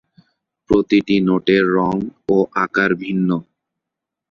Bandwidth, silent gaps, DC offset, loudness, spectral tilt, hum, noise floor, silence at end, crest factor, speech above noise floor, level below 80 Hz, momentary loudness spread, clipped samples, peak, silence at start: 7 kHz; none; under 0.1%; -17 LUFS; -7.5 dB/octave; none; -83 dBFS; 0.9 s; 16 dB; 67 dB; -48 dBFS; 6 LU; under 0.1%; -2 dBFS; 0.7 s